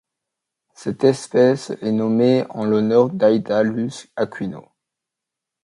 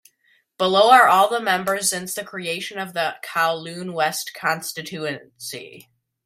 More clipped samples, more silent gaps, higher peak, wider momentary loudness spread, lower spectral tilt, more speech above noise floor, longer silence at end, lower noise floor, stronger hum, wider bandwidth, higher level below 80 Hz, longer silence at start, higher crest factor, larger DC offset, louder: neither; neither; about the same, -2 dBFS vs 0 dBFS; second, 13 LU vs 17 LU; first, -6.5 dB/octave vs -2.5 dB/octave; first, 66 dB vs 42 dB; first, 1.05 s vs 0.45 s; first, -84 dBFS vs -63 dBFS; neither; second, 11 kHz vs 16 kHz; first, -62 dBFS vs -70 dBFS; first, 0.8 s vs 0.6 s; about the same, 18 dB vs 22 dB; neither; about the same, -19 LUFS vs -20 LUFS